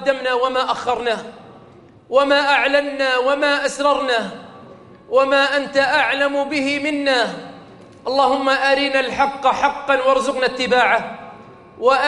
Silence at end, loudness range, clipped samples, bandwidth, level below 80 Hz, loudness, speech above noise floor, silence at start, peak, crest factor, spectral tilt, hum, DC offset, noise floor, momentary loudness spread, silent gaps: 0 s; 1 LU; under 0.1%; 11.5 kHz; -54 dBFS; -17 LUFS; 28 dB; 0 s; -2 dBFS; 18 dB; -3 dB/octave; none; under 0.1%; -45 dBFS; 8 LU; none